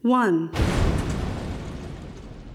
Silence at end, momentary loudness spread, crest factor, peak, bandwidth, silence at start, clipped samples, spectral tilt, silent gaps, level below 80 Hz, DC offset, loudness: 0 s; 18 LU; 16 dB; -8 dBFS; 15 kHz; 0.05 s; under 0.1%; -6.5 dB/octave; none; -32 dBFS; under 0.1%; -25 LUFS